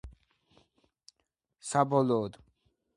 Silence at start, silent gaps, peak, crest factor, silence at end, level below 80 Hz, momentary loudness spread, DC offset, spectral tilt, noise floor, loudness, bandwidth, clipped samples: 0.05 s; none; -10 dBFS; 22 dB; 0.65 s; -60 dBFS; 15 LU; under 0.1%; -6 dB/octave; -81 dBFS; -29 LUFS; 11.5 kHz; under 0.1%